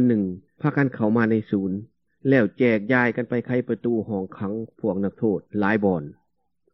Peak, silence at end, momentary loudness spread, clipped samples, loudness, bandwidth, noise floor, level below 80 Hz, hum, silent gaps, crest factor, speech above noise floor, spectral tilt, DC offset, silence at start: -4 dBFS; 0.6 s; 9 LU; under 0.1%; -23 LUFS; 5.8 kHz; -72 dBFS; -66 dBFS; none; none; 20 dB; 50 dB; -10 dB/octave; under 0.1%; 0 s